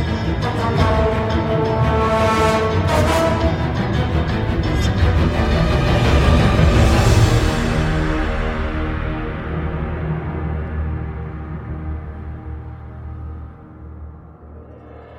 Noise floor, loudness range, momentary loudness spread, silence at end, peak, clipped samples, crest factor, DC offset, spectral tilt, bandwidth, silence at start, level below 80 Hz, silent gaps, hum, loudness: -38 dBFS; 15 LU; 18 LU; 0 s; -2 dBFS; under 0.1%; 16 dB; under 0.1%; -6.5 dB/octave; 15.5 kHz; 0 s; -24 dBFS; none; none; -18 LUFS